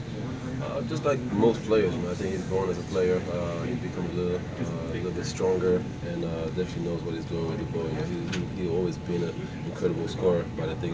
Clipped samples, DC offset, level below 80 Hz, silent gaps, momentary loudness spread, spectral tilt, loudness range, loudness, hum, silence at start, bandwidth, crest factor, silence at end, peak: under 0.1%; under 0.1%; -46 dBFS; none; 8 LU; -7 dB/octave; 3 LU; -29 LUFS; none; 0 s; 8 kHz; 18 dB; 0 s; -10 dBFS